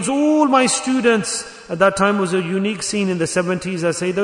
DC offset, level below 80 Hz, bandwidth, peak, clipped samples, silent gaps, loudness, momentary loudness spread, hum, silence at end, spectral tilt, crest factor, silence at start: under 0.1%; -56 dBFS; 11 kHz; -2 dBFS; under 0.1%; none; -18 LUFS; 7 LU; none; 0 s; -4 dB/octave; 16 dB; 0 s